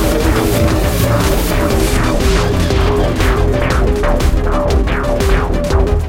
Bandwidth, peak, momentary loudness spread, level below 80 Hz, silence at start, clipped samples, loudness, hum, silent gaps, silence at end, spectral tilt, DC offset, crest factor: 16.5 kHz; 0 dBFS; 2 LU; -16 dBFS; 0 s; under 0.1%; -14 LUFS; none; none; 0 s; -5.5 dB/octave; under 0.1%; 12 dB